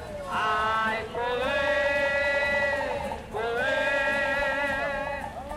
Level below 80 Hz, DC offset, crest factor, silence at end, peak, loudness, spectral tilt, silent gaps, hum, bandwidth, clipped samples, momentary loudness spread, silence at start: -48 dBFS; under 0.1%; 14 dB; 0 s; -14 dBFS; -26 LUFS; -4 dB/octave; none; none; 15.5 kHz; under 0.1%; 8 LU; 0 s